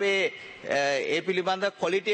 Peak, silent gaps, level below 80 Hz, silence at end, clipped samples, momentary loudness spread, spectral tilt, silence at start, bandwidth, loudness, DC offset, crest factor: -12 dBFS; none; -72 dBFS; 0 s; under 0.1%; 5 LU; -3.5 dB/octave; 0 s; 8.8 kHz; -27 LUFS; under 0.1%; 14 dB